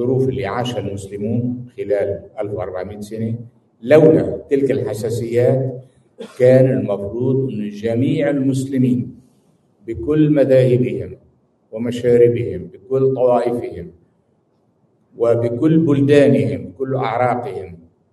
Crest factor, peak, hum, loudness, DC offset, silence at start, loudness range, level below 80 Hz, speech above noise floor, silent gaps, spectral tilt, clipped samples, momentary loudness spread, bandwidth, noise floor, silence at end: 18 dB; 0 dBFS; none; -17 LUFS; under 0.1%; 0 s; 3 LU; -52 dBFS; 44 dB; none; -8 dB/octave; under 0.1%; 17 LU; 12.5 kHz; -61 dBFS; 0.35 s